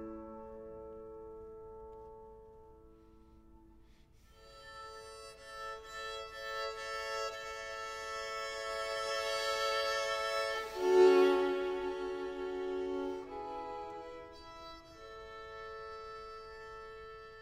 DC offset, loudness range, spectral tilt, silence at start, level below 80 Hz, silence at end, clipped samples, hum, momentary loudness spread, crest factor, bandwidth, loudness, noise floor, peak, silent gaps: under 0.1%; 23 LU; -3 dB/octave; 0 s; -64 dBFS; 0 s; under 0.1%; none; 18 LU; 22 dB; 16 kHz; -35 LUFS; -62 dBFS; -16 dBFS; none